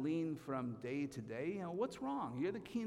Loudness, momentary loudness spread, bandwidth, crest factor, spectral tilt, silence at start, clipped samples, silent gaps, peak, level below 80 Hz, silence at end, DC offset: -42 LUFS; 3 LU; 14 kHz; 14 dB; -7 dB/octave; 0 s; under 0.1%; none; -28 dBFS; -74 dBFS; 0 s; under 0.1%